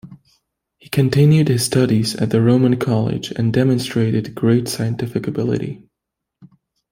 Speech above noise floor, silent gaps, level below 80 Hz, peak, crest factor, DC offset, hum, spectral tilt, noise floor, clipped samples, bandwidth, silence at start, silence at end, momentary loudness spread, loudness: 64 dB; none; -50 dBFS; -2 dBFS; 16 dB; under 0.1%; none; -6.5 dB/octave; -81 dBFS; under 0.1%; 16.5 kHz; 0.05 s; 1.15 s; 9 LU; -17 LUFS